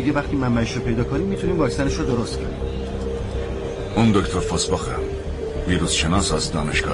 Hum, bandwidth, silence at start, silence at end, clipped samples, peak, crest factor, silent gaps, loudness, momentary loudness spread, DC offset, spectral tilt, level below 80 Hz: none; 11.5 kHz; 0 s; 0 s; under 0.1%; -8 dBFS; 14 dB; none; -22 LUFS; 9 LU; under 0.1%; -5 dB/octave; -30 dBFS